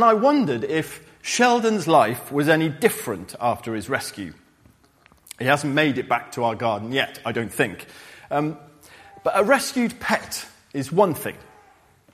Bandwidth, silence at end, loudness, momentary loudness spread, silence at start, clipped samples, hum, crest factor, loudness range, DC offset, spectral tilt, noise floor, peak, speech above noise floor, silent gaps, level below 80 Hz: 15.5 kHz; 0.7 s; -22 LUFS; 15 LU; 0 s; under 0.1%; none; 22 dB; 4 LU; under 0.1%; -4.5 dB/octave; -56 dBFS; -2 dBFS; 35 dB; none; -60 dBFS